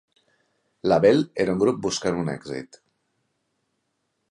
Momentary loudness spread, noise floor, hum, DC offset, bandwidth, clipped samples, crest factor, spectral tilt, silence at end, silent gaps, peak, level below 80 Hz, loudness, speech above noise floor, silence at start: 15 LU; -75 dBFS; none; under 0.1%; 11 kHz; under 0.1%; 20 dB; -5.5 dB/octave; 1.65 s; none; -6 dBFS; -58 dBFS; -22 LUFS; 53 dB; 0.85 s